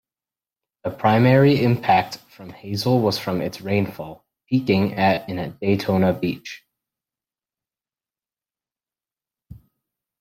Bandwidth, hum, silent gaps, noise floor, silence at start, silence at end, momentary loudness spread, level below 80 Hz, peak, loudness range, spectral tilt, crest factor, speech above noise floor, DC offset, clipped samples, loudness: 16 kHz; none; none; under -90 dBFS; 0.85 s; 0.65 s; 18 LU; -58 dBFS; -4 dBFS; 7 LU; -7 dB/octave; 20 dB; over 70 dB; under 0.1%; under 0.1%; -20 LUFS